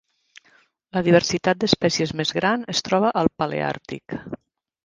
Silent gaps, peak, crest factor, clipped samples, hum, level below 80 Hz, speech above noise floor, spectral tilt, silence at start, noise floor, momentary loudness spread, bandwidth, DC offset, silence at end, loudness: none; 0 dBFS; 22 dB; under 0.1%; none; -54 dBFS; 38 dB; -4.5 dB/octave; 0.95 s; -59 dBFS; 15 LU; 9.8 kHz; under 0.1%; 0.5 s; -21 LUFS